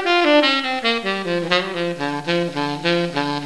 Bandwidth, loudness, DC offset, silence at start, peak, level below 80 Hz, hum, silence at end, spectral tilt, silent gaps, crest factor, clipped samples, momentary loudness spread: 11 kHz; -19 LUFS; 0.5%; 0 s; -2 dBFS; -58 dBFS; none; 0 s; -5 dB/octave; none; 18 dB; under 0.1%; 9 LU